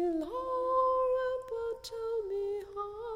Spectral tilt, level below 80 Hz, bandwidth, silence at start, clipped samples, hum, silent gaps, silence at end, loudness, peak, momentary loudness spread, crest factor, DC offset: -5 dB/octave; -60 dBFS; 14.5 kHz; 0 s; under 0.1%; none; none; 0 s; -33 LUFS; -20 dBFS; 10 LU; 14 dB; under 0.1%